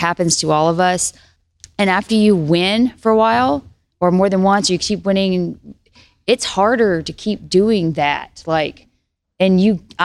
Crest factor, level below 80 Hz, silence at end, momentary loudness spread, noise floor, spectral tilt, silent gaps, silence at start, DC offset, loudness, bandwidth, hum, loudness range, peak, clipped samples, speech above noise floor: 14 dB; -48 dBFS; 0 s; 9 LU; -68 dBFS; -4.5 dB/octave; none; 0 s; under 0.1%; -16 LUFS; 12.5 kHz; none; 3 LU; -2 dBFS; under 0.1%; 52 dB